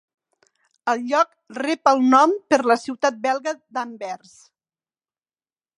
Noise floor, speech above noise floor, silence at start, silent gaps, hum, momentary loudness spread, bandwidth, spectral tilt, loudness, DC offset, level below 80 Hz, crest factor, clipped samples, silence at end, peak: under -90 dBFS; over 70 dB; 0.85 s; none; none; 15 LU; 11 kHz; -3 dB/octave; -20 LUFS; under 0.1%; -76 dBFS; 20 dB; under 0.1%; 1.6 s; -2 dBFS